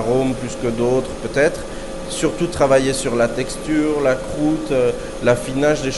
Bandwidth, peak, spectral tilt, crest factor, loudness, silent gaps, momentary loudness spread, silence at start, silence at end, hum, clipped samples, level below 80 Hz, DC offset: 11.5 kHz; -2 dBFS; -5 dB/octave; 16 dB; -19 LUFS; none; 7 LU; 0 s; 0 s; none; under 0.1%; -34 dBFS; under 0.1%